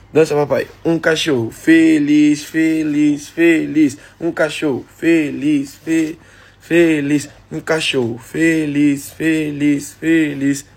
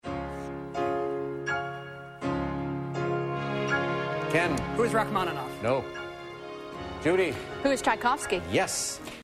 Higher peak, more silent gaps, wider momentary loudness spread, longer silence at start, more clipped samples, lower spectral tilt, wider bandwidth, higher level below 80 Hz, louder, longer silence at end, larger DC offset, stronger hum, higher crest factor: first, 0 dBFS vs -12 dBFS; neither; second, 7 LU vs 13 LU; about the same, 0.15 s vs 0.05 s; neither; about the same, -5.5 dB/octave vs -4.5 dB/octave; about the same, 16 kHz vs 15.5 kHz; about the same, -52 dBFS vs -52 dBFS; first, -16 LUFS vs -29 LUFS; first, 0.15 s vs 0 s; neither; neither; about the same, 14 dB vs 16 dB